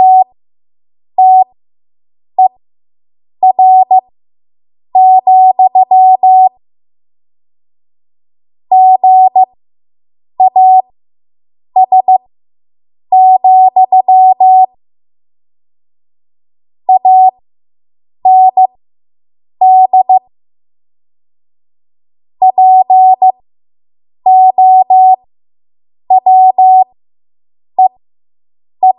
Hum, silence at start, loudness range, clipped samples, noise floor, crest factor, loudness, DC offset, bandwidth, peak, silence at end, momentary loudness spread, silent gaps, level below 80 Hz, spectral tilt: none; 0 s; 4 LU; under 0.1%; under -90 dBFS; 10 dB; -7 LUFS; under 0.1%; 1 kHz; 0 dBFS; 0.05 s; 7 LU; none; -70 dBFS; -9 dB/octave